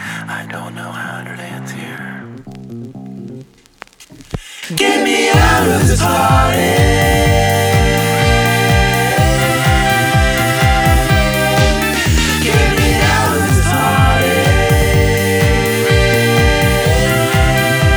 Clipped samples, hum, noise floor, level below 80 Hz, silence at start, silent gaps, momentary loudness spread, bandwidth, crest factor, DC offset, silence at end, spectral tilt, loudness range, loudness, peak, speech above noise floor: under 0.1%; none; -40 dBFS; -22 dBFS; 0 s; none; 16 LU; over 20 kHz; 12 dB; under 0.1%; 0 s; -4.5 dB/octave; 15 LU; -12 LUFS; 0 dBFS; 26 dB